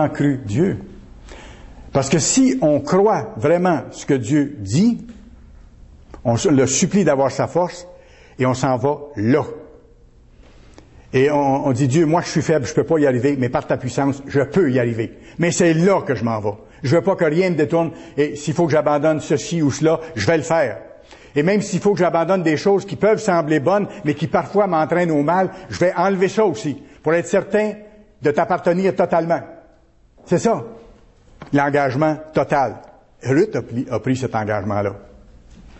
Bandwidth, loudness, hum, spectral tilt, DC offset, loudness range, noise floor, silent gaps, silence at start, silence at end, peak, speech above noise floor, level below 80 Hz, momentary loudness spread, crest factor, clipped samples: 8.4 kHz; -18 LUFS; none; -6 dB/octave; under 0.1%; 3 LU; -52 dBFS; none; 0 s; 0.1 s; -4 dBFS; 35 dB; -48 dBFS; 8 LU; 14 dB; under 0.1%